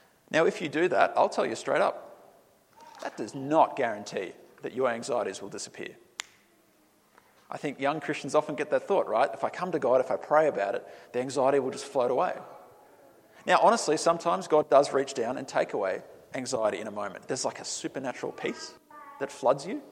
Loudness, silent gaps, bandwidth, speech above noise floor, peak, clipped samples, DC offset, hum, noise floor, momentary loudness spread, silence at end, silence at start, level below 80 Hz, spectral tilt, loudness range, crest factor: -28 LUFS; none; 14 kHz; 36 dB; -8 dBFS; under 0.1%; under 0.1%; none; -64 dBFS; 15 LU; 0 s; 0.3 s; -78 dBFS; -4 dB/octave; 8 LU; 22 dB